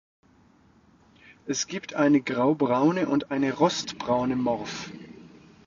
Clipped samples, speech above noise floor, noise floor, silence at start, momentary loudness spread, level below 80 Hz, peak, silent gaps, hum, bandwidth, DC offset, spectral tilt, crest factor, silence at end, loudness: under 0.1%; 34 dB; -59 dBFS; 1.45 s; 15 LU; -62 dBFS; -8 dBFS; none; none; 7.6 kHz; under 0.1%; -5 dB/octave; 18 dB; 0.45 s; -25 LUFS